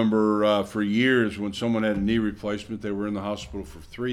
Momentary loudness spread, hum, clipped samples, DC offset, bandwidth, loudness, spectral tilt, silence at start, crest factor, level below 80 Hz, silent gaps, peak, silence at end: 12 LU; none; under 0.1%; under 0.1%; 12.5 kHz; -25 LUFS; -6 dB/octave; 0 s; 16 dB; -48 dBFS; none; -8 dBFS; 0 s